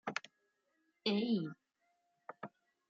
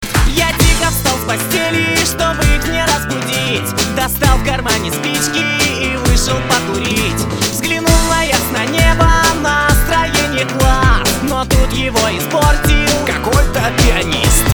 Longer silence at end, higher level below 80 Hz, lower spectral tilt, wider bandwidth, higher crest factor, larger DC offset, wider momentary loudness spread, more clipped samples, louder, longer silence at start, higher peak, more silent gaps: first, 0.4 s vs 0 s; second, -90 dBFS vs -18 dBFS; about the same, -4 dB/octave vs -3.5 dB/octave; second, 7.6 kHz vs over 20 kHz; first, 22 dB vs 12 dB; second, under 0.1% vs 0.1%; first, 22 LU vs 4 LU; neither; second, -38 LUFS vs -13 LUFS; about the same, 0.05 s vs 0 s; second, -20 dBFS vs 0 dBFS; neither